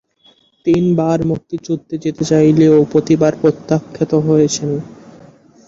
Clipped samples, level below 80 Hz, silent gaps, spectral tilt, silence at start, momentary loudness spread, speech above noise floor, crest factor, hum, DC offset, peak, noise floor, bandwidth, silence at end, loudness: under 0.1%; -50 dBFS; none; -7 dB/octave; 0.65 s; 12 LU; 39 dB; 14 dB; none; under 0.1%; -2 dBFS; -52 dBFS; 7.8 kHz; 0.8 s; -15 LUFS